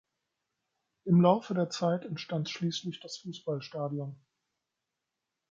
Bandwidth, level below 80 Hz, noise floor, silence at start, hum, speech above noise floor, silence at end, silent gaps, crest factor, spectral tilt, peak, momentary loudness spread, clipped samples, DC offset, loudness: 7.6 kHz; -76 dBFS; -87 dBFS; 1.05 s; none; 57 dB; 1.35 s; none; 22 dB; -6.5 dB/octave; -10 dBFS; 17 LU; under 0.1%; under 0.1%; -31 LUFS